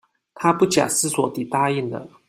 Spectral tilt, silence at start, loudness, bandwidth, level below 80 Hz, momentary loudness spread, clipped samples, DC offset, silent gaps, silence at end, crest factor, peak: -4 dB/octave; 0.35 s; -21 LUFS; 16 kHz; -62 dBFS; 6 LU; under 0.1%; under 0.1%; none; 0.2 s; 18 dB; -2 dBFS